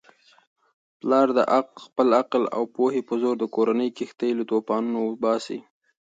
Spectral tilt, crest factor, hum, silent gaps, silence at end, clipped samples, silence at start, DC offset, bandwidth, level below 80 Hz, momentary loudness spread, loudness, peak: -6 dB/octave; 18 dB; none; none; 0.45 s; under 0.1%; 1.05 s; under 0.1%; 9 kHz; -76 dBFS; 9 LU; -24 LUFS; -6 dBFS